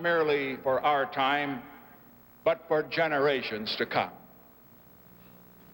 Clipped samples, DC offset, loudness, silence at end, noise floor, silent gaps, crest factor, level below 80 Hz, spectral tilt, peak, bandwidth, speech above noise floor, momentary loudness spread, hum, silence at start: under 0.1%; under 0.1%; -28 LUFS; 1.55 s; -55 dBFS; none; 18 dB; -66 dBFS; -6 dB/octave; -12 dBFS; 16.5 kHz; 27 dB; 7 LU; 60 Hz at -60 dBFS; 0 s